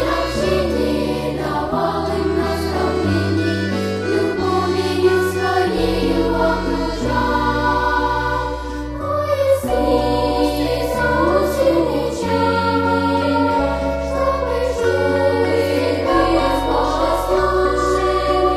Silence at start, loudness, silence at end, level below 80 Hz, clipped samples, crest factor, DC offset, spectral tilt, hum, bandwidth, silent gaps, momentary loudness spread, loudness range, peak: 0 s; -18 LUFS; 0 s; -30 dBFS; under 0.1%; 14 dB; under 0.1%; -6 dB/octave; none; 15 kHz; none; 4 LU; 2 LU; -4 dBFS